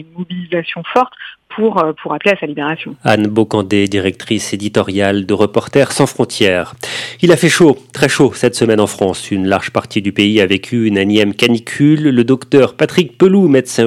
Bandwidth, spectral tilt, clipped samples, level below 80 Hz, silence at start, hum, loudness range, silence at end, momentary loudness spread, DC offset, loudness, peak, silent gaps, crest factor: 15 kHz; -5 dB/octave; 0.4%; -54 dBFS; 0 s; none; 3 LU; 0 s; 9 LU; under 0.1%; -13 LUFS; 0 dBFS; none; 12 dB